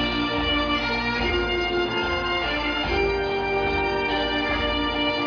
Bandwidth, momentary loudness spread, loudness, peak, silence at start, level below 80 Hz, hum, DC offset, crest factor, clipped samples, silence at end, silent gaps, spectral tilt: 5.4 kHz; 1 LU; -23 LUFS; -10 dBFS; 0 s; -36 dBFS; none; under 0.1%; 12 dB; under 0.1%; 0 s; none; -5.5 dB/octave